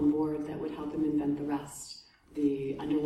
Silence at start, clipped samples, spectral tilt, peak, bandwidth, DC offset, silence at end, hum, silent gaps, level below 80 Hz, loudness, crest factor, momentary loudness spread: 0 s; under 0.1%; -6.5 dB/octave; -18 dBFS; 13 kHz; under 0.1%; 0 s; none; none; -60 dBFS; -33 LUFS; 14 dB; 13 LU